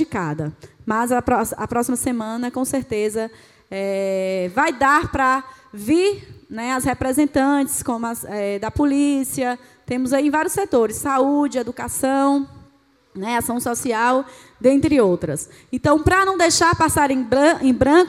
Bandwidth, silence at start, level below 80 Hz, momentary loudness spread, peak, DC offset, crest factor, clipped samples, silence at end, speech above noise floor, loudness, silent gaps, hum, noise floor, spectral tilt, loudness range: 16 kHz; 0 s; -44 dBFS; 12 LU; -2 dBFS; under 0.1%; 18 dB; under 0.1%; 0 s; 37 dB; -19 LUFS; none; none; -56 dBFS; -4.5 dB/octave; 5 LU